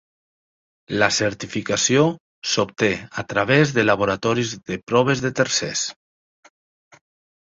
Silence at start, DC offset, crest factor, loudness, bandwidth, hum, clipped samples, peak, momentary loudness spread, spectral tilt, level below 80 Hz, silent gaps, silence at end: 0.9 s; under 0.1%; 20 dB; -20 LUFS; 8 kHz; none; under 0.1%; -2 dBFS; 10 LU; -4 dB/octave; -54 dBFS; 2.20-2.42 s, 4.83-4.87 s; 1.5 s